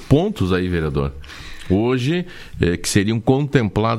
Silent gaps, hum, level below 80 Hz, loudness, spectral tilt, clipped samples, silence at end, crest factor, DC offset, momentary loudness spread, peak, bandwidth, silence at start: none; none; -36 dBFS; -19 LUFS; -6 dB/octave; under 0.1%; 0 s; 18 dB; under 0.1%; 13 LU; 0 dBFS; 14 kHz; 0 s